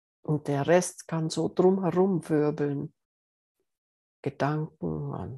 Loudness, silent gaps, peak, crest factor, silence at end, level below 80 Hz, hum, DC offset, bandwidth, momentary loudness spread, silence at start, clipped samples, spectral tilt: -27 LUFS; 3.05-3.55 s, 3.78-4.23 s; -10 dBFS; 20 dB; 0 s; -64 dBFS; none; under 0.1%; 12.5 kHz; 11 LU; 0.3 s; under 0.1%; -6.5 dB/octave